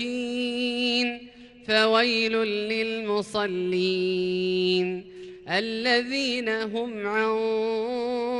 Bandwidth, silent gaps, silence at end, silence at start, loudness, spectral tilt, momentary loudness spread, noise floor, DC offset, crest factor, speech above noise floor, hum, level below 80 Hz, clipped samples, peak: 11.5 kHz; none; 0 s; 0 s; -25 LUFS; -4.5 dB/octave; 7 LU; -47 dBFS; under 0.1%; 18 dB; 22 dB; none; -64 dBFS; under 0.1%; -8 dBFS